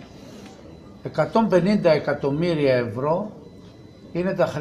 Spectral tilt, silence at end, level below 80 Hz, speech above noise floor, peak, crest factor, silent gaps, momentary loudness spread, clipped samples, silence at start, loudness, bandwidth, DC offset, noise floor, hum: -7.5 dB/octave; 0 s; -54 dBFS; 24 dB; -6 dBFS; 18 dB; none; 23 LU; under 0.1%; 0 s; -22 LUFS; 12 kHz; under 0.1%; -44 dBFS; none